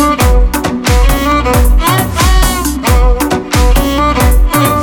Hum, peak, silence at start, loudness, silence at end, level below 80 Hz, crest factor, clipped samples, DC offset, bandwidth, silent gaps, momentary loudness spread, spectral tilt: none; 0 dBFS; 0 s; -11 LUFS; 0 s; -10 dBFS; 8 dB; under 0.1%; under 0.1%; 18.5 kHz; none; 3 LU; -5 dB/octave